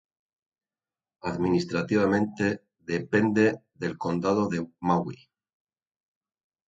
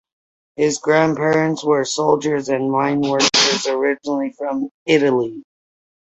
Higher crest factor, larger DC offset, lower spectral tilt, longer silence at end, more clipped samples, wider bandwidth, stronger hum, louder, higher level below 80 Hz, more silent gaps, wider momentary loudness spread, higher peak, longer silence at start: about the same, 20 dB vs 16 dB; neither; first, -7 dB/octave vs -3.5 dB/octave; first, 1.55 s vs 0.6 s; neither; about the same, 7.8 kHz vs 8.2 kHz; neither; second, -27 LUFS vs -18 LUFS; about the same, -58 dBFS vs -60 dBFS; second, none vs 4.71-4.86 s; about the same, 11 LU vs 9 LU; second, -8 dBFS vs -2 dBFS; first, 1.25 s vs 0.6 s